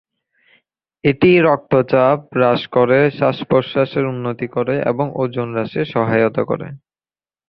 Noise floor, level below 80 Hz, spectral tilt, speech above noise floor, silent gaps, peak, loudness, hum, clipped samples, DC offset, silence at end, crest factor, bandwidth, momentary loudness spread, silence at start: under -90 dBFS; -52 dBFS; -10 dB/octave; over 74 dB; none; -2 dBFS; -17 LUFS; none; under 0.1%; under 0.1%; 0.7 s; 16 dB; 5.6 kHz; 8 LU; 1.05 s